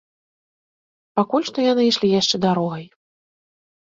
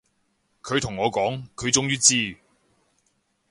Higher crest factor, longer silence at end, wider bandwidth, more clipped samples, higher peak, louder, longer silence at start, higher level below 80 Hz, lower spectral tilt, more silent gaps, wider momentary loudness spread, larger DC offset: second, 18 dB vs 24 dB; second, 1 s vs 1.15 s; second, 7.8 kHz vs 11.5 kHz; neither; about the same, -4 dBFS vs -4 dBFS; first, -19 LUFS vs -22 LUFS; first, 1.15 s vs 0.65 s; second, -64 dBFS vs -56 dBFS; first, -5 dB/octave vs -2.5 dB/octave; neither; second, 9 LU vs 12 LU; neither